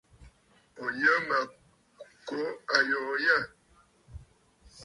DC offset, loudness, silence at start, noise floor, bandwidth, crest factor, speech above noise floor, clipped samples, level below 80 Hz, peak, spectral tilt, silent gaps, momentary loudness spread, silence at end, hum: under 0.1%; -28 LUFS; 0.2 s; -64 dBFS; 11.5 kHz; 26 dB; 36 dB; under 0.1%; -60 dBFS; -6 dBFS; -3.5 dB/octave; none; 14 LU; 0 s; none